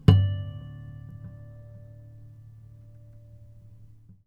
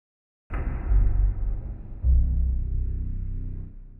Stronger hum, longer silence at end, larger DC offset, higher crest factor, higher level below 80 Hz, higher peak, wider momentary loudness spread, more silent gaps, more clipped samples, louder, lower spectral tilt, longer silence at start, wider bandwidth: neither; first, 3 s vs 0 s; neither; first, 28 dB vs 14 dB; second, -46 dBFS vs -24 dBFS; first, -2 dBFS vs -12 dBFS; first, 23 LU vs 13 LU; neither; neither; about the same, -28 LUFS vs -28 LUFS; second, -9 dB/octave vs -12 dB/octave; second, 0.1 s vs 0.5 s; first, 5.2 kHz vs 2.8 kHz